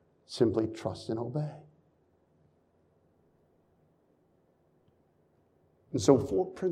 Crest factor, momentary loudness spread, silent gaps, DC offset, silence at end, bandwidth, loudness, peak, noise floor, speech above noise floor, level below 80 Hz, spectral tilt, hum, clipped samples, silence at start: 26 dB; 15 LU; none; under 0.1%; 0 s; 13 kHz; -30 LUFS; -8 dBFS; -69 dBFS; 40 dB; -66 dBFS; -6.5 dB/octave; none; under 0.1%; 0.3 s